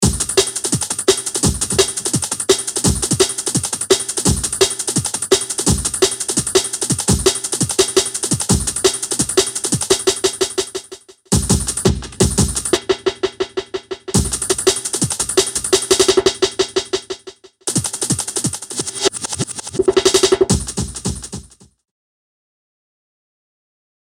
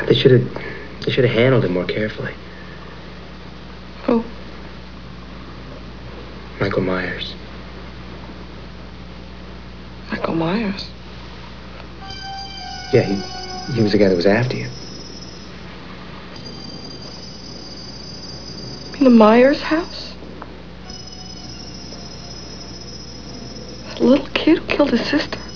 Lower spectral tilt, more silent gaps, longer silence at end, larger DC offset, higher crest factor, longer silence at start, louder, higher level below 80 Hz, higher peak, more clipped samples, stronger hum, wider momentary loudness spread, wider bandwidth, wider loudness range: second, -3 dB/octave vs -6.5 dB/octave; neither; first, 2.65 s vs 0 s; second, under 0.1% vs 1%; about the same, 18 dB vs 20 dB; about the same, 0 s vs 0 s; about the same, -17 LUFS vs -19 LUFS; first, -34 dBFS vs -42 dBFS; about the same, 0 dBFS vs 0 dBFS; neither; neither; second, 8 LU vs 21 LU; first, 17 kHz vs 5.4 kHz; second, 3 LU vs 14 LU